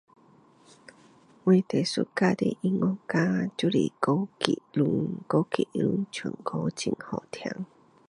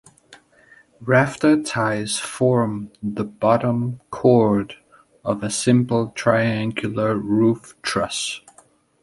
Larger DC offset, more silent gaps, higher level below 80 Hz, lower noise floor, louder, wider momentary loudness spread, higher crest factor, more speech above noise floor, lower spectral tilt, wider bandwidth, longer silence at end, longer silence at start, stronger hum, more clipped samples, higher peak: neither; neither; second, -66 dBFS vs -54 dBFS; about the same, -58 dBFS vs -55 dBFS; second, -28 LUFS vs -20 LUFS; about the same, 11 LU vs 10 LU; first, 28 dB vs 18 dB; second, 31 dB vs 35 dB; about the same, -6 dB/octave vs -5.5 dB/octave; about the same, 11 kHz vs 11.5 kHz; second, 0.45 s vs 0.65 s; first, 1.45 s vs 0.3 s; neither; neither; about the same, 0 dBFS vs -2 dBFS